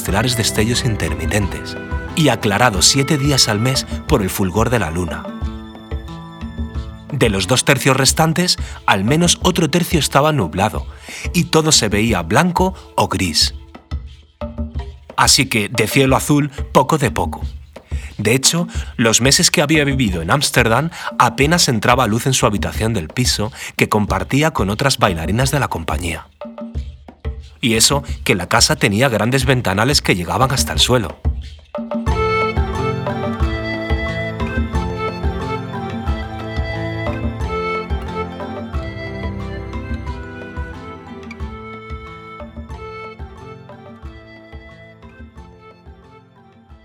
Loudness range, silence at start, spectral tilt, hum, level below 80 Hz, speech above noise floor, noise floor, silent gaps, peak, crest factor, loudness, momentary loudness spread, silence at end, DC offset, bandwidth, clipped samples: 14 LU; 0 s; -4 dB/octave; none; -30 dBFS; 31 dB; -47 dBFS; none; 0 dBFS; 18 dB; -16 LUFS; 18 LU; 0.1 s; under 0.1%; over 20 kHz; under 0.1%